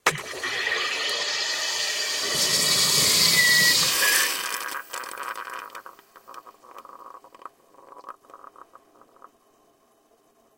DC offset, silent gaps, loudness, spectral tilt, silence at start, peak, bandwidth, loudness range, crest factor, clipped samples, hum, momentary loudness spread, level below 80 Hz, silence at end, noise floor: under 0.1%; none; -20 LUFS; 0.5 dB/octave; 0.05 s; -4 dBFS; 17 kHz; 20 LU; 22 dB; under 0.1%; none; 18 LU; -64 dBFS; 2.2 s; -62 dBFS